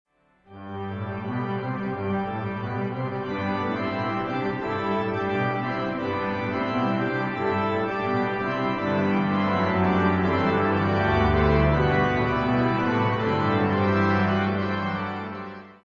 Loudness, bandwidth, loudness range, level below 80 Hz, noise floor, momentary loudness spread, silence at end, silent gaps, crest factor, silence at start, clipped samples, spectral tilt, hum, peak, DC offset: -25 LUFS; 7.2 kHz; 6 LU; -40 dBFS; -53 dBFS; 8 LU; 0.15 s; none; 16 dB; 0.5 s; under 0.1%; -8.5 dB/octave; none; -8 dBFS; under 0.1%